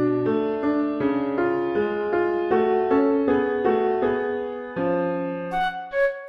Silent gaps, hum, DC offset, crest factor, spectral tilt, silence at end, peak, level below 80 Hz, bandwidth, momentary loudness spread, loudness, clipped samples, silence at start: none; none; under 0.1%; 14 dB; -8.5 dB/octave; 0 s; -8 dBFS; -54 dBFS; 5.8 kHz; 6 LU; -23 LUFS; under 0.1%; 0 s